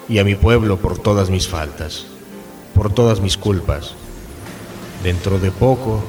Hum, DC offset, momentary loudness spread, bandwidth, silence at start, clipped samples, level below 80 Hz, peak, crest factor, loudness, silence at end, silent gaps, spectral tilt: none; under 0.1%; 20 LU; 19.5 kHz; 0 s; under 0.1%; -30 dBFS; 0 dBFS; 18 dB; -17 LUFS; 0 s; none; -6 dB/octave